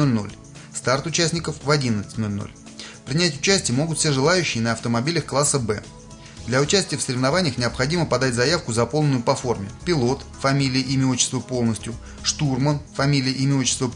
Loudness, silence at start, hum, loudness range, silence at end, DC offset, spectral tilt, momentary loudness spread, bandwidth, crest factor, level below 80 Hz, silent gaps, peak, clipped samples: -21 LUFS; 0 s; none; 2 LU; 0 s; under 0.1%; -4 dB/octave; 11 LU; 11 kHz; 18 dB; -46 dBFS; none; -4 dBFS; under 0.1%